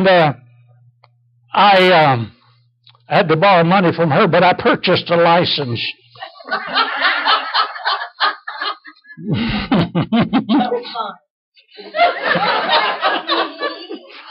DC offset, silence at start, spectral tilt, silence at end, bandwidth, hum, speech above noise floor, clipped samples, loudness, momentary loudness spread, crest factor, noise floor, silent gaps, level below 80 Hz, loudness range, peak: under 0.1%; 0 s; -7.5 dB/octave; 0 s; 6.4 kHz; none; 40 dB; under 0.1%; -15 LUFS; 14 LU; 12 dB; -55 dBFS; 11.30-11.52 s; -48 dBFS; 5 LU; -4 dBFS